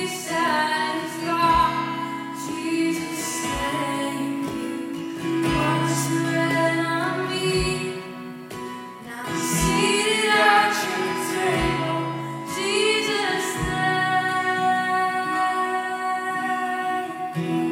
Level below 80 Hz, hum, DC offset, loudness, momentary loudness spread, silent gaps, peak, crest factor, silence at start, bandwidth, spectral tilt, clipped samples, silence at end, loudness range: -44 dBFS; none; under 0.1%; -23 LUFS; 11 LU; none; -4 dBFS; 18 dB; 0 s; 16.5 kHz; -4 dB/octave; under 0.1%; 0 s; 4 LU